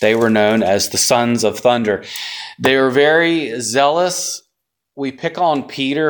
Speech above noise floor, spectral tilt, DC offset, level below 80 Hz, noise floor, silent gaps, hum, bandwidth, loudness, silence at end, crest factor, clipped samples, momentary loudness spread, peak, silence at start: 59 dB; -3.5 dB/octave; under 0.1%; -58 dBFS; -75 dBFS; none; none; 19.5 kHz; -15 LUFS; 0 s; 16 dB; under 0.1%; 12 LU; 0 dBFS; 0 s